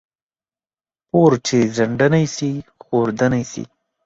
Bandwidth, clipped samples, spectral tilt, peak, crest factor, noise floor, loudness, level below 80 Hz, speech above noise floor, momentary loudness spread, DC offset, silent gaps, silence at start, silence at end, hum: 8 kHz; under 0.1%; -6 dB/octave; -2 dBFS; 18 dB; under -90 dBFS; -18 LUFS; -54 dBFS; over 73 dB; 15 LU; under 0.1%; none; 1.15 s; 0.4 s; none